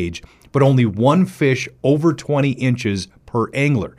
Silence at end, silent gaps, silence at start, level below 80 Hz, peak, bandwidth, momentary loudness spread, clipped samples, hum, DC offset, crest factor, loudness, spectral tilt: 0.1 s; none; 0 s; -50 dBFS; -4 dBFS; 12 kHz; 9 LU; under 0.1%; none; under 0.1%; 14 dB; -18 LUFS; -7 dB/octave